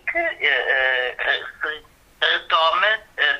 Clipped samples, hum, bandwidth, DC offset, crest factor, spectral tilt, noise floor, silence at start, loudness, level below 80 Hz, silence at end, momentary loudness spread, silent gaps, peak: under 0.1%; none; 14.5 kHz; under 0.1%; 18 dB; -1.5 dB/octave; -40 dBFS; 0.05 s; -20 LUFS; -56 dBFS; 0 s; 10 LU; none; -4 dBFS